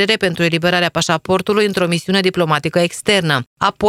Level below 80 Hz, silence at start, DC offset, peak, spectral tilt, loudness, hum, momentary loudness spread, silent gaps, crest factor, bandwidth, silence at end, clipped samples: -50 dBFS; 0 s; under 0.1%; 0 dBFS; -4.5 dB/octave; -16 LUFS; none; 3 LU; 3.47-3.57 s; 16 dB; 15.5 kHz; 0 s; under 0.1%